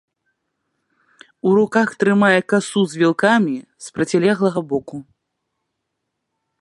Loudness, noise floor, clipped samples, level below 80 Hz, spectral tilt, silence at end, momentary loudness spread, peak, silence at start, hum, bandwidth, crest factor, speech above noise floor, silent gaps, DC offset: -17 LUFS; -77 dBFS; under 0.1%; -64 dBFS; -5.5 dB/octave; 1.6 s; 11 LU; -2 dBFS; 1.45 s; none; 11.5 kHz; 18 dB; 60 dB; none; under 0.1%